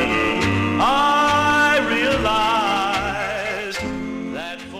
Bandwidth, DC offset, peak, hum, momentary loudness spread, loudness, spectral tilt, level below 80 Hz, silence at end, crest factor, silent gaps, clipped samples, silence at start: 15.5 kHz; 0.1%; -6 dBFS; none; 11 LU; -19 LUFS; -4 dB/octave; -40 dBFS; 0 s; 12 dB; none; under 0.1%; 0 s